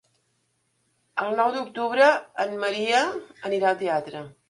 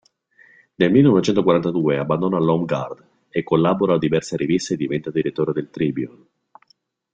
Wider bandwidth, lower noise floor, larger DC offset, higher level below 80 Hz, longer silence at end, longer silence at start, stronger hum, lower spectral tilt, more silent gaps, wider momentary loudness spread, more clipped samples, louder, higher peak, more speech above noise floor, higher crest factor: first, 11.5 kHz vs 9 kHz; first, -71 dBFS vs -62 dBFS; neither; second, -74 dBFS vs -56 dBFS; second, 0.2 s vs 1.05 s; first, 1.15 s vs 0.8 s; neither; second, -3.5 dB/octave vs -7 dB/octave; neither; about the same, 11 LU vs 11 LU; neither; second, -24 LUFS vs -20 LUFS; second, -6 dBFS vs -2 dBFS; first, 47 dB vs 43 dB; about the same, 18 dB vs 18 dB